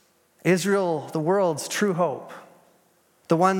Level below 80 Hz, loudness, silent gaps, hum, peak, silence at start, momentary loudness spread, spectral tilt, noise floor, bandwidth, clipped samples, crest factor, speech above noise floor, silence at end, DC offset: -80 dBFS; -24 LUFS; none; none; -6 dBFS; 0.45 s; 12 LU; -5.5 dB/octave; -62 dBFS; 17.5 kHz; under 0.1%; 18 dB; 40 dB; 0 s; under 0.1%